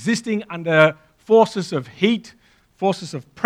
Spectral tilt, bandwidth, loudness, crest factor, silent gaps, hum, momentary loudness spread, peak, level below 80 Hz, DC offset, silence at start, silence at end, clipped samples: -5.5 dB/octave; 12 kHz; -19 LUFS; 20 dB; none; none; 11 LU; 0 dBFS; -64 dBFS; under 0.1%; 0 s; 0 s; under 0.1%